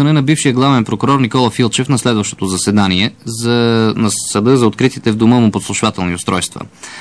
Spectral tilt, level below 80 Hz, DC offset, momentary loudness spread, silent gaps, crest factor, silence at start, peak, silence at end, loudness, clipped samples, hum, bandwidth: -5 dB/octave; -48 dBFS; 0.2%; 6 LU; none; 12 dB; 0 s; 0 dBFS; 0 s; -13 LUFS; under 0.1%; none; 11 kHz